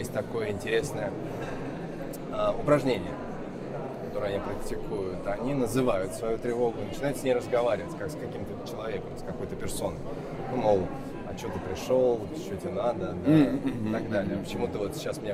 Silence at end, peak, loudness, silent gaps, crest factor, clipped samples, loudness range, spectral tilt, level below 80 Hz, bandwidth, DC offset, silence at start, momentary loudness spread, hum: 0 s; -10 dBFS; -30 LUFS; none; 20 dB; under 0.1%; 4 LU; -6.5 dB/octave; -46 dBFS; 16 kHz; under 0.1%; 0 s; 11 LU; none